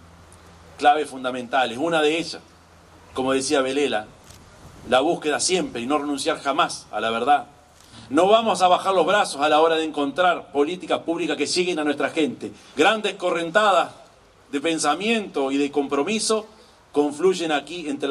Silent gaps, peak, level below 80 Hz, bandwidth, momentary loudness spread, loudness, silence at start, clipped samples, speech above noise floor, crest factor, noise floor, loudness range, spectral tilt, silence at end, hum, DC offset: none; -4 dBFS; -62 dBFS; 13 kHz; 8 LU; -22 LUFS; 0.8 s; under 0.1%; 30 dB; 20 dB; -51 dBFS; 4 LU; -3 dB/octave; 0 s; none; under 0.1%